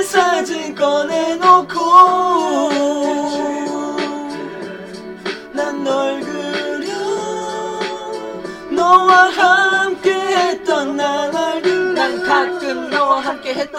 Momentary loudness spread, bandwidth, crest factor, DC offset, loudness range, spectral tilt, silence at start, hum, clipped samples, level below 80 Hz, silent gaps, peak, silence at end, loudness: 15 LU; 16 kHz; 16 dB; under 0.1%; 8 LU; -3 dB/octave; 0 s; none; under 0.1%; -58 dBFS; none; 0 dBFS; 0 s; -15 LUFS